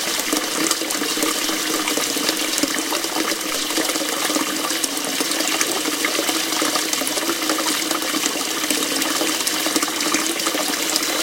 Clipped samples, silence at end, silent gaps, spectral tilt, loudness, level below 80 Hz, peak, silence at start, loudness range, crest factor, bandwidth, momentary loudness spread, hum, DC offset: under 0.1%; 0 s; none; 0 dB/octave; -19 LUFS; -62 dBFS; 0 dBFS; 0 s; 1 LU; 22 dB; 17 kHz; 2 LU; none; under 0.1%